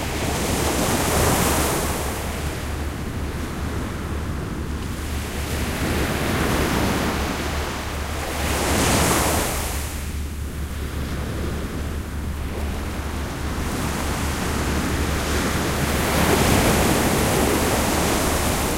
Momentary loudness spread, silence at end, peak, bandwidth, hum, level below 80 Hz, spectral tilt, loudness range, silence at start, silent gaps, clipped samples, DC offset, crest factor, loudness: 10 LU; 0 s; -4 dBFS; 16 kHz; none; -30 dBFS; -4 dB/octave; 8 LU; 0 s; none; under 0.1%; under 0.1%; 18 dB; -23 LUFS